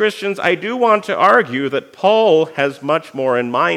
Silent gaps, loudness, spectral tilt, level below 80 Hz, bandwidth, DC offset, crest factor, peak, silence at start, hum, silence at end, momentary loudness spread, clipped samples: none; -15 LUFS; -5 dB/octave; -76 dBFS; 13.5 kHz; under 0.1%; 14 dB; 0 dBFS; 0 s; none; 0 s; 7 LU; under 0.1%